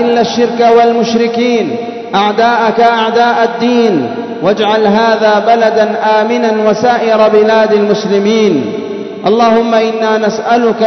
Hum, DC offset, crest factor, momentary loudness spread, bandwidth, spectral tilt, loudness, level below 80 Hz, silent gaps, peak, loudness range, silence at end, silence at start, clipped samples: none; 0.1%; 10 dB; 6 LU; 6.4 kHz; -5 dB/octave; -10 LUFS; -54 dBFS; none; 0 dBFS; 2 LU; 0 s; 0 s; 0.2%